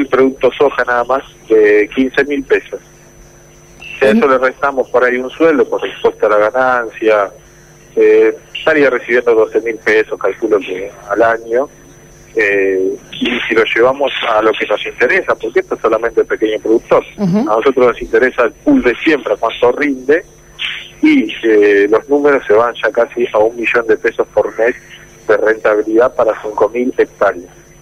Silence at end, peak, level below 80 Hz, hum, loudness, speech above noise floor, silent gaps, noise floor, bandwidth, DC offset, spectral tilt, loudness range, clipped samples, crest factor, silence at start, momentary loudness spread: 0.35 s; -2 dBFS; -46 dBFS; none; -13 LUFS; 29 dB; none; -41 dBFS; 11 kHz; under 0.1%; -5.5 dB/octave; 3 LU; under 0.1%; 10 dB; 0 s; 7 LU